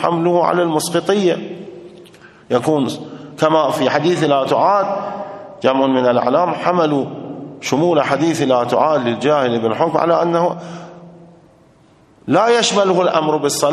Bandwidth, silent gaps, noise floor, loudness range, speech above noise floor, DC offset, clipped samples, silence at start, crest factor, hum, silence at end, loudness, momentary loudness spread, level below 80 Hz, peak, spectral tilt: 13 kHz; none; -50 dBFS; 3 LU; 35 dB; under 0.1%; under 0.1%; 0 s; 16 dB; none; 0 s; -16 LUFS; 15 LU; -62 dBFS; 0 dBFS; -5 dB/octave